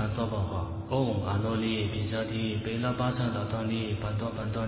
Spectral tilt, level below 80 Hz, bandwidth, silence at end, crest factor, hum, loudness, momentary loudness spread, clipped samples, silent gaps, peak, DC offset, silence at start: -6 dB/octave; -44 dBFS; 4 kHz; 0 s; 16 dB; none; -31 LUFS; 4 LU; under 0.1%; none; -14 dBFS; under 0.1%; 0 s